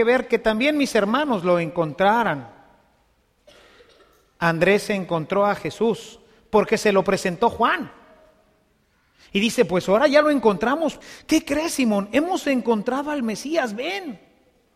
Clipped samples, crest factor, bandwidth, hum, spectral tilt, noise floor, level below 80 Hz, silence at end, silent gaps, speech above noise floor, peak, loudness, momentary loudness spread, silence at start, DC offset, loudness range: under 0.1%; 18 dB; 15.5 kHz; none; -5 dB/octave; -63 dBFS; -54 dBFS; 0.6 s; none; 43 dB; -4 dBFS; -21 LUFS; 8 LU; 0 s; under 0.1%; 4 LU